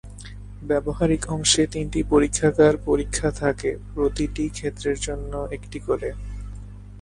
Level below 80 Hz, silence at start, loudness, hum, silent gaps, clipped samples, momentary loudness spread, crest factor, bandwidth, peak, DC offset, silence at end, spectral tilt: -36 dBFS; 0.05 s; -23 LUFS; 50 Hz at -35 dBFS; none; under 0.1%; 19 LU; 20 dB; 11.5 kHz; -4 dBFS; under 0.1%; 0 s; -4.5 dB/octave